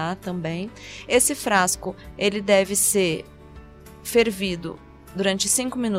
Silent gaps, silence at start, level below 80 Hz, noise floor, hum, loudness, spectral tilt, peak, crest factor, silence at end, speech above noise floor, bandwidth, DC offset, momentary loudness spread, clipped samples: none; 0 s; -50 dBFS; -44 dBFS; none; -22 LUFS; -3 dB/octave; -6 dBFS; 18 dB; 0 s; 21 dB; 16 kHz; under 0.1%; 16 LU; under 0.1%